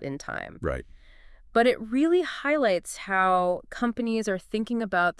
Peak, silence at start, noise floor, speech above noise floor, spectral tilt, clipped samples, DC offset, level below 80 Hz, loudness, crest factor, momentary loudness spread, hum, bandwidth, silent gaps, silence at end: -8 dBFS; 0 s; -50 dBFS; 24 dB; -5 dB/octave; under 0.1%; under 0.1%; -50 dBFS; -26 LUFS; 18 dB; 10 LU; none; 12 kHz; none; 0.1 s